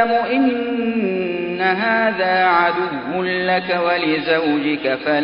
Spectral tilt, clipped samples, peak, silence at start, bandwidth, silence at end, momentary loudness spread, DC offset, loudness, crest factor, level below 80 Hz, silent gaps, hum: -10 dB/octave; under 0.1%; -2 dBFS; 0 s; 5.4 kHz; 0 s; 6 LU; under 0.1%; -18 LUFS; 16 dB; -58 dBFS; none; none